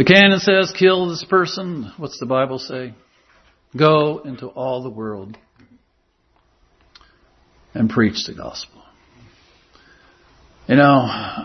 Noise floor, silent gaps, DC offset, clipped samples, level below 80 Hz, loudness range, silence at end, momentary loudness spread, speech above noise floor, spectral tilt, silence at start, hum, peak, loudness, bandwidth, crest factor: -63 dBFS; none; under 0.1%; under 0.1%; -56 dBFS; 10 LU; 0 s; 21 LU; 46 dB; -5.5 dB/octave; 0 s; none; 0 dBFS; -17 LUFS; 6.4 kHz; 20 dB